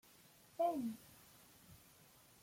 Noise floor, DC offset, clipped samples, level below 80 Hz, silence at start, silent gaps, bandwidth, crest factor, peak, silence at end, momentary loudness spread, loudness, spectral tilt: -66 dBFS; under 0.1%; under 0.1%; -80 dBFS; 0.6 s; none; 16.5 kHz; 20 dB; -26 dBFS; 0.65 s; 25 LU; -42 LUFS; -5.5 dB/octave